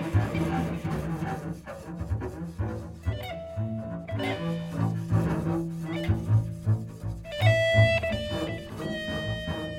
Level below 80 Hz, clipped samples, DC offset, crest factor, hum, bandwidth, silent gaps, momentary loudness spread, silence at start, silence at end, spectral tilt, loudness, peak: -44 dBFS; under 0.1%; under 0.1%; 20 dB; none; 14 kHz; none; 12 LU; 0 s; 0 s; -7 dB/octave; -29 LUFS; -10 dBFS